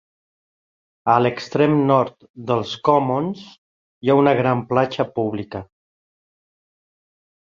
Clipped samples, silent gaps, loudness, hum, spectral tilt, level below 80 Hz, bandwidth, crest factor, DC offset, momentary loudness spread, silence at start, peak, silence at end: under 0.1%; 2.30-2.34 s, 3.58-4.01 s; -19 LUFS; none; -7.5 dB/octave; -58 dBFS; 7.4 kHz; 20 dB; under 0.1%; 13 LU; 1.05 s; -2 dBFS; 1.75 s